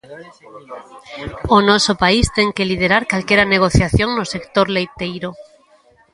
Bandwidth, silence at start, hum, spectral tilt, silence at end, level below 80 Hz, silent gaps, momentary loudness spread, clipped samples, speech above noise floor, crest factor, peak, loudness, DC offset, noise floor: 11.5 kHz; 0.1 s; none; -4.5 dB/octave; 0.7 s; -32 dBFS; none; 19 LU; under 0.1%; 36 dB; 18 dB; 0 dBFS; -15 LUFS; under 0.1%; -52 dBFS